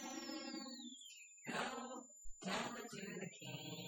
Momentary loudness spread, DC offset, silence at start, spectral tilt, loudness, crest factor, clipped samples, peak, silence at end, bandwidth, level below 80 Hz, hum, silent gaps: 10 LU; under 0.1%; 0 s; -3 dB/octave; -48 LUFS; 18 dB; under 0.1%; -30 dBFS; 0 s; 17.5 kHz; -72 dBFS; none; none